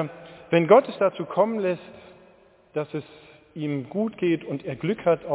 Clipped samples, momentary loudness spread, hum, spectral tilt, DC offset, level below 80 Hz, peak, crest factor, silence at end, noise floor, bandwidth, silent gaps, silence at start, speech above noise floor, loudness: under 0.1%; 16 LU; none; -11 dB/octave; under 0.1%; -66 dBFS; -4 dBFS; 22 dB; 0 s; -56 dBFS; 4 kHz; none; 0 s; 32 dB; -24 LUFS